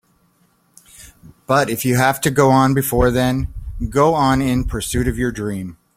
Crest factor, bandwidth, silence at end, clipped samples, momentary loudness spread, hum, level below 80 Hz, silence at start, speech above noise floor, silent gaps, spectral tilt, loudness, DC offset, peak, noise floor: 16 dB; 16.5 kHz; 0.25 s; under 0.1%; 11 LU; none; -32 dBFS; 1 s; 43 dB; none; -5.5 dB/octave; -17 LUFS; under 0.1%; -2 dBFS; -59 dBFS